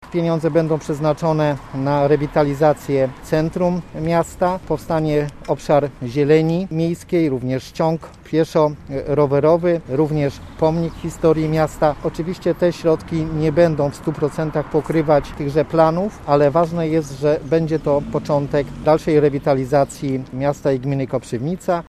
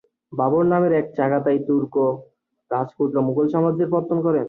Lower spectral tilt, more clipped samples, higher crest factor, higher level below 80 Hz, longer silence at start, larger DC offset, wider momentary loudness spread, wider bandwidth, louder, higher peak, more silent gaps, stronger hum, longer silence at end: second, -7.5 dB/octave vs -11.5 dB/octave; neither; about the same, 18 dB vs 14 dB; first, -42 dBFS vs -64 dBFS; second, 0 s vs 0.3 s; neither; about the same, 7 LU vs 8 LU; first, 14 kHz vs 4 kHz; about the same, -19 LUFS vs -21 LUFS; first, 0 dBFS vs -6 dBFS; neither; neither; about the same, 0.05 s vs 0 s